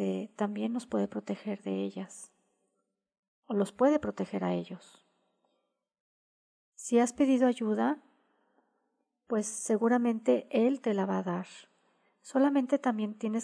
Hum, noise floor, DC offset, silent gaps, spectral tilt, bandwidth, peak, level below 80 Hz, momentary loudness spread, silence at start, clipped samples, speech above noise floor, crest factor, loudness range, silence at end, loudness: none; -81 dBFS; under 0.1%; 3.19-3.42 s, 6.00-6.72 s; -6 dB/octave; 11 kHz; -14 dBFS; -74 dBFS; 11 LU; 0 s; under 0.1%; 52 dB; 18 dB; 5 LU; 0 s; -30 LUFS